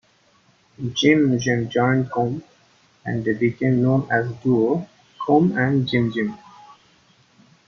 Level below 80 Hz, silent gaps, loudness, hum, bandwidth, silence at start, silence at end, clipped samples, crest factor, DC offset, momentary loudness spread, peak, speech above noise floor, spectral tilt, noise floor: -58 dBFS; none; -20 LUFS; none; 7 kHz; 0.8 s; 0.95 s; under 0.1%; 18 dB; under 0.1%; 12 LU; -4 dBFS; 39 dB; -6.5 dB/octave; -59 dBFS